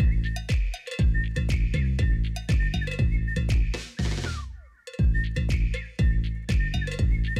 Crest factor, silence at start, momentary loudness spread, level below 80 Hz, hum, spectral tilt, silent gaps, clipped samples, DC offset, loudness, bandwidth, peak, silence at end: 8 dB; 0 s; 5 LU; -26 dBFS; none; -6 dB/octave; none; under 0.1%; under 0.1%; -27 LUFS; 11 kHz; -16 dBFS; 0 s